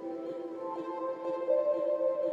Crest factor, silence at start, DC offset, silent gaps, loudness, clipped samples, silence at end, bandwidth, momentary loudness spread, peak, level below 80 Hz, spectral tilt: 14 dB; 0 s; under 0.1%; none; -33 LUFS; under 0.1%; 0 s; 5.6 kHz; 10 LU; -18 dBFS; under -90 dBFS; -7 dB/octave